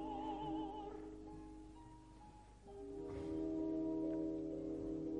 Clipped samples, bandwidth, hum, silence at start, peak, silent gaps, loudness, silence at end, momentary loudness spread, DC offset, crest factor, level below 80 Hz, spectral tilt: under 0.1%; 9.8 kHz; none; 0 s; -32 dBFS; none; -45 LUFS; 0 s; 19 LU; under 0.1%; 14 dB; -62 dBFS; -8 dB/octave